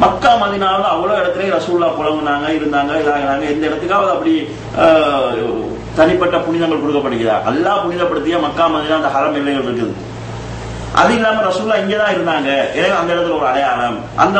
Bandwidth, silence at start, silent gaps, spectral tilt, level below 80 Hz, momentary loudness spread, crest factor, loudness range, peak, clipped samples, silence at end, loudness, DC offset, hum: 8.8 kHz; 0 s; none; -5.5 dB/octave; -40 dBFS; 7 LU; 14 dB; 2 LU; 0 dBFS; under 0.1%; 0 s; -15 LUFS; under 0.1%; none